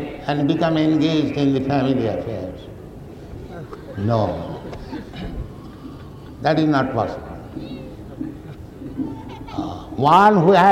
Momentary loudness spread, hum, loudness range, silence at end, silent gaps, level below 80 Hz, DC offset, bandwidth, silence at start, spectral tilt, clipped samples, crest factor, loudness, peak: 21 LU; none; 7 LU; 0 s; none; -42 dBFS; under 0.1%; 12.5 kHz; 0 s; -7.5 dB/octave; under 0.1%; 16 dB; -19 LUFS; -4 dBFS